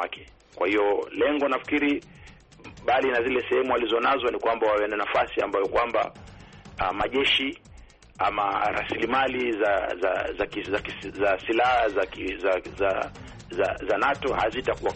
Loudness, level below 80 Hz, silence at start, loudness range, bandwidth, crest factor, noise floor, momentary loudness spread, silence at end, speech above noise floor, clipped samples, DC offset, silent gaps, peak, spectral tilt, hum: -25 LUFS; -50 dBFS; 0 s; 2 LU; 8.4 kHz; 14 dB; -49 dBFS; 7 LU; 0 s; 24 dB; under 0.1%; under 0.1%; none; -12 dBFS; -5 dB/octave; none